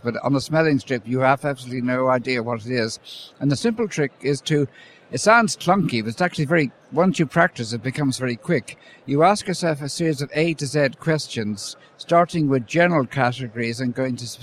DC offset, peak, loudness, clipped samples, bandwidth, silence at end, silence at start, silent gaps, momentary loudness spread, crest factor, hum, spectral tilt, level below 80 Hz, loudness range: under 0.1%; -2 dBFS; -21 LUFS; under 0.1%; 14.5 kHz; 0 s; 0.05 s; none; 9 LU; 20 dB; none; -5.5 dB/octave; -60 dBFS; 3 LU